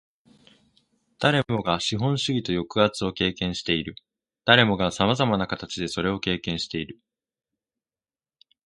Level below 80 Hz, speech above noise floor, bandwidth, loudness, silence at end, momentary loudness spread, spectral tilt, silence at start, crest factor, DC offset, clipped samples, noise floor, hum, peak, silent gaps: -52 dBFS; over 66 dB; 11.5 kHz; -24 LUFS; 1.7 s; 11 LU; -5 dB/octave; 1.2 s; 26 dB; under 0.1%; under 0.1%; under -90 dBFS; none; 0 dBFS; none